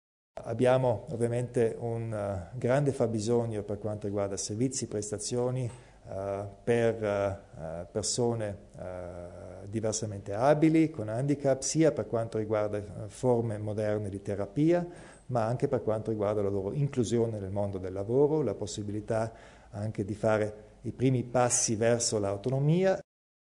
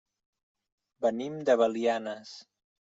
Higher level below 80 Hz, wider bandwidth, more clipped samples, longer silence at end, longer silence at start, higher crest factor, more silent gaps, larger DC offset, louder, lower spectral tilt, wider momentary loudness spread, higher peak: first, -58 dBFS vs -78 dBFS; first, 11 kHz vs 7.8 kHz; neither; about the same, 0.45 s vs 0.5 s; second, 0.35 s vs 1 s; about the same, 18 dB vs 20 dB; neither; neither; about the same, -30 LUFS vs -29 LUFS; about the same, -5.5 dB/octave vs -5 dB/octave; second, 13 LU vs 19 LU; about the same, -12 dBFS vs -12 dBFS